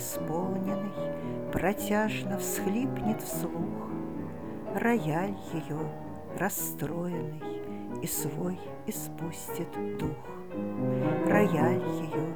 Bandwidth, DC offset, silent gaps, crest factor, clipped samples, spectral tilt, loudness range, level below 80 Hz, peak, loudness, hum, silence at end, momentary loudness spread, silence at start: over 20 kHz; 0.5%; none; 20 dB; under 0.1%; -5.5 dB/octave; 5 LU; -56 dBFS; -12 dBFS; -32 LUFS; none; 0 s; 11 LU; 0 s